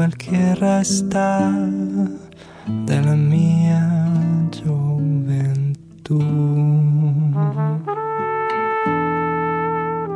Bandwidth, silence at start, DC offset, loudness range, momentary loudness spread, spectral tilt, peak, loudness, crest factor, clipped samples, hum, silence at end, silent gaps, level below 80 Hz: 11 kHz; 0 s; under 0.1%; 1 LU; 7 LU; -7 dB/octave; -6 dBFS; -19 LUFS; 12 dB; under 0.1%; none; 0 s; none; -54 dBFS